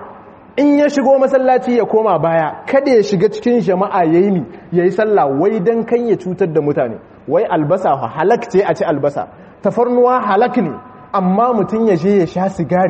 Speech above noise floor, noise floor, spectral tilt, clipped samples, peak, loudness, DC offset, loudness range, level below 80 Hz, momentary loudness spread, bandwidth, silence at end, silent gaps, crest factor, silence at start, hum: 24 dB; -37 dBFS; -7.5 dB/octave; under 0.1%; 0 dBFS; -14 LUFS; under 0.1%; 3 LU; -54 dBFS; 7 LU; 8.4 kHz; 0 s; none; 14 dB; 0 s; none